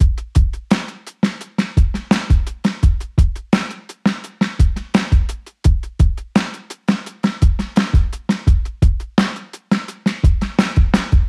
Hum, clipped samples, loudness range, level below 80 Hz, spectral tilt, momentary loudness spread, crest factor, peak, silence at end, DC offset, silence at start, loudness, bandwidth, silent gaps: none; under 0.1%; 1 LU; -18 dBFS; -6.5 dB/octave; 6 LU; 14 dB; -2 dBFS; 0 s; under 0.1%; 0 s; -18 LUFS; 11 kHz; none